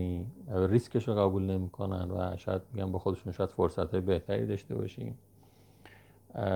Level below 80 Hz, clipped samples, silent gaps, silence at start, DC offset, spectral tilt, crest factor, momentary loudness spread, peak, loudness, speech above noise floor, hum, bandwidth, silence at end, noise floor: -60 dBFS; under 0.1%; none; 0 s; under 0.1%; -8.5 dB/octave; 20 dB; 10 LU; -12 dBFS; -33 LUFS; 28 dB; none; 19 kHz; 0 s; -60 dBFS